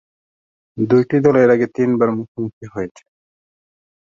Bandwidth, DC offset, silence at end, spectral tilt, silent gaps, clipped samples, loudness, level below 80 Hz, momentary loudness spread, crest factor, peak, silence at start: 7.4 kHz; under 0.1%; 1.25 s; -9 dB/octave; 2.28-2.35 s, 2.53-2.61 s; under 0.1%; -16 LUFS; -58 dBFS; 15 LU; 16 dB; -2 dBFS; 0.75 s